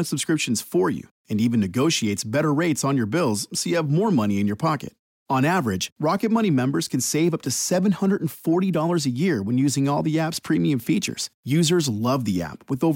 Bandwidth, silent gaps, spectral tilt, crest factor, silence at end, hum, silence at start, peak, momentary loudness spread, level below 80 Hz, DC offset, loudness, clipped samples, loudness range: 17 kHz; 1.11-1.25 s, 4.99-5.26 s, 5.92-5.96 s, 11.34-11.43 s; -5 dB/octave; 12 dB; 0 s; none; 0 s; -10 dBFS; 5 LU; -60 dBFS; under 0.1%; -22 LUFS; under 0.1%; 1 LU